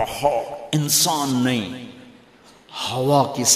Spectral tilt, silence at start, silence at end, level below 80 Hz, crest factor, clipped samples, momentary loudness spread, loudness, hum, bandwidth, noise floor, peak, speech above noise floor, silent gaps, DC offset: -3.5 dB/octave; 0 s; 0 s; -54 dBFS; 20 dB; under 0.1%; 17 LU; -20 LUFS; none; 15.5 kHz; -50 dBFS; -2 dBFS; 29 dB; none; under 0.1%